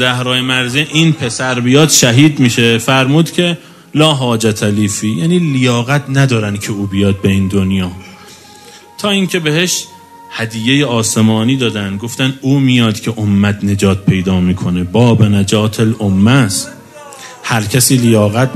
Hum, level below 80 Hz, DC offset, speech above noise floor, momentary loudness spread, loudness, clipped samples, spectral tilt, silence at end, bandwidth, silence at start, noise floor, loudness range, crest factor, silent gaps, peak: none; -46 dBFS; under 0.1%; 26 dB; 9 LU; -12 LUFS; 0.2%; -4.5 dB/octave; 0 s; 15 kHz; 0 s; -37 dBFS; 5 LU; 12 dB; none; 0 dBFS